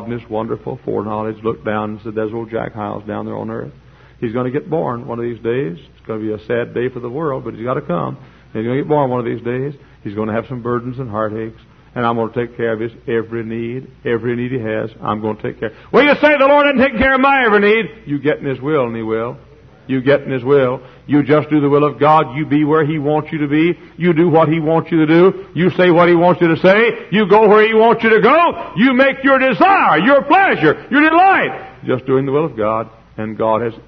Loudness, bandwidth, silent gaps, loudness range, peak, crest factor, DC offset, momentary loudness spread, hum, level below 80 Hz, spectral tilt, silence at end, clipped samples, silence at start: -15 LUFS; 6.2 kHz; none; 11 LU; 0 dBFS; 14 dB; under 0.1%; 13 LU; none; -48 dBFS; -8.5 dB/octave; 0.05 s; under 0.1%; 0 s